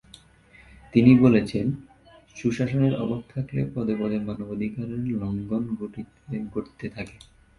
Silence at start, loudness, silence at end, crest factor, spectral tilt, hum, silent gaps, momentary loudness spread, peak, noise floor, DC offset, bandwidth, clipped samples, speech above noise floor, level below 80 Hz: 0.95 s; -25 LUFS; 0.45 s; 22 dB; -8.5 dB/octave; none; none; 19 LU; -4 dBFS; -54 dBFS; under 0.1%; 11 kHz; under 0.1%; 30 dB; -52 dBFS